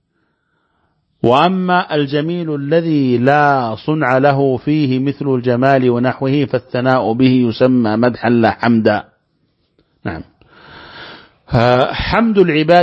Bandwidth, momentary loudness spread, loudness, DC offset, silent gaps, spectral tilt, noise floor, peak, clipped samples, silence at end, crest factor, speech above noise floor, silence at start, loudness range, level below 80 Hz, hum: 6.8 kHz; 8 LU; -14 LUFS; under 0.1%; none; -8.5 dB/octave; -65 dBFS; 0 dBFS; under 0.1%; 0 s; 14 dB; 51 dB; 1.25 s; 5 LU; -42 dBFS; none